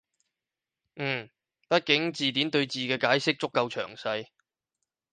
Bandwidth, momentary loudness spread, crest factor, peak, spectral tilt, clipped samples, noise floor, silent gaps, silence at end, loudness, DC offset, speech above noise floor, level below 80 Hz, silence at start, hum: 9.8 kHz; 9 LU; 22 dB; -8 dBFS; -4.5 dB/octave; under 0.1%; -89 dBFS; none; 0.9 s; -27 LUFS; under 0.1%; 62 dB; -74 dBFS; 0.95 s; none